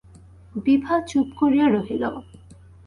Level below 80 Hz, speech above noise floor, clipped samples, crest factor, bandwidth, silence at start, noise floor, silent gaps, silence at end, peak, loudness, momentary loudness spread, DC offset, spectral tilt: -52 dBFS; 27 dB; under 0.1%; 14 dB; 11 kHz; 0.55 s; -47 dBFS; none; 0.65 s; -8 dBFS; -21 LUFS; 11 LU; under 0.1%; -6.5 dB/octave